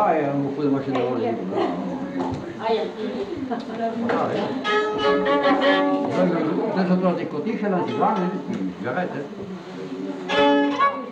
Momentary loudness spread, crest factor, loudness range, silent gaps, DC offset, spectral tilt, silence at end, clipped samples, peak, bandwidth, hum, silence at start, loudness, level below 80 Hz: 10 LU; 16 dB; 5 LU; none; under 0.1%; -7 dB/octave; 0 s; under 0.1%; -6 dBFS; 8.4 kHz; none; 0 s; -23 LUFS; -60 dBFS